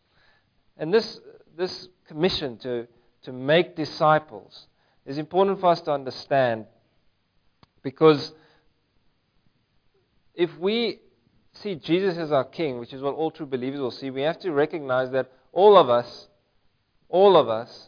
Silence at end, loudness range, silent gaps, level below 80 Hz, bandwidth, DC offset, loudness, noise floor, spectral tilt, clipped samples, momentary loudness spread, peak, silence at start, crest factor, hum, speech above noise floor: 0.1 s; 7 LU; none; -64 dBFS; 5.2 kHz; under 0.1%; -23 LUFS; -66 dBFS; -7 dB/octave; under 0.1%; 19 LU; -4 dBFS; 0.8 s; 22 dB; none; 44 dB